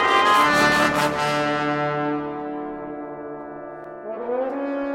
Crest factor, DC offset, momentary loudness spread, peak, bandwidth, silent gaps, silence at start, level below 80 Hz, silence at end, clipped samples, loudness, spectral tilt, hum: 18 dB; under 0.1%; 19 LU; -6 dBFS; 16 kHz; none; 0 s; -56 dBFS; 0 s; under 0.1%; -21 LUFS; -4 dB/octave; none